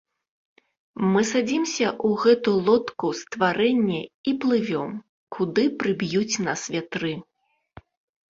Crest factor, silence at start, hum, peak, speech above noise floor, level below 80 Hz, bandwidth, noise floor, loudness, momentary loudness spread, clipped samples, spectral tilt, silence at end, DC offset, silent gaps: 18 dB; 0.95 s; none; -6 dBFS; 28 dB; -64 dBFS; 7.8 kHz; -50 dBFS; -23 LUFS; 9 LU; under 0.1%; -5 dB/octave; 1.1 s; under 0.1%; 4.14-4.24 s, 5.09-5.27 s